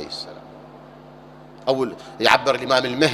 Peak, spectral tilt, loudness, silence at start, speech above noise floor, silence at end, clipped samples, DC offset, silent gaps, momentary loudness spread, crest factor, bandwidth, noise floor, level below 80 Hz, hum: 0 dBFS; -4 dB/octave; -20 LUFS; 0 s; 24 dB; 0 s; under 0.1%; under 0.1%; none; 20 LU; 22 dB; 16 kHz; -43 dBFS; -58 dBFS; none